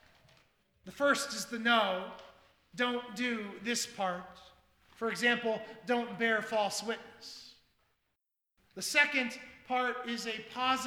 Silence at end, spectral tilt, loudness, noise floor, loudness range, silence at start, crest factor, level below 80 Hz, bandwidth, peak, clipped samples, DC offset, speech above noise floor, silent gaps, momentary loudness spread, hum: 0 s; -2 dB/octave; -32 LUFS; -85 dBFS; 3 LU; 0.85 s; 24 dB; -74 dBFS; 17.5 kHz; -10 dBFS; under 0.1%; under 0.1%; 51 dB; none; 19 LU; none